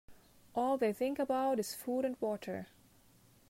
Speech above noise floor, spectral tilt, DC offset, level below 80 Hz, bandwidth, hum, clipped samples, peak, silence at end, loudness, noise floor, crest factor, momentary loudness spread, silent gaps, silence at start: 30 dB; -5 dB/octave; under 0.1%; -72 dBFS; 16 kHz; none; under 0.1%; -20 dBFS; 0.85 s; -36 LUFS; -65 dBFS; 16 dB; 10 LU; none; 0.1 s